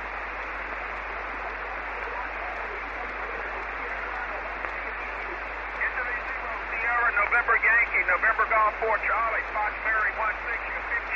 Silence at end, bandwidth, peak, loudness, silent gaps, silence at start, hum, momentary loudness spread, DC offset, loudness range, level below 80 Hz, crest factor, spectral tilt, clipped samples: 0 s; 7.6 kHz; -10 dBFS; -27 LUFS; none; 0 s; none; 11 LU; under 0.1%; 9 LU; -46 dBFS; 18 dB; -5 dB/octave; under 0.1%